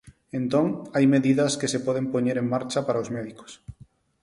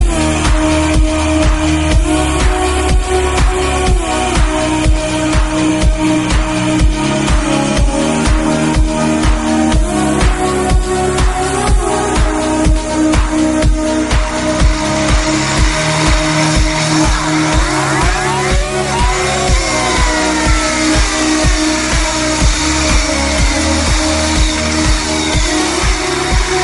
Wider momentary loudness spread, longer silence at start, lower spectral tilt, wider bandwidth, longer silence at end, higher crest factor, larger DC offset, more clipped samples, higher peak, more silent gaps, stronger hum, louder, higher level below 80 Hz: first, 16 LU vs 2 LU; about the same, 0.05 s vs 0 s; first, -5.5 dB/octave vs -4 dB/octave; about the same, 11.5 kHz vs 11.5 kHz; first, 0.5 s vs 0 s; about the same, 16 dB vs 12 dB; neither; neither; second, -8 dBFS vs 0 dBFS; neither; neither; second, -24 LUFS vs -13 LUFS; second, -60 dBFS vs -16 dBFS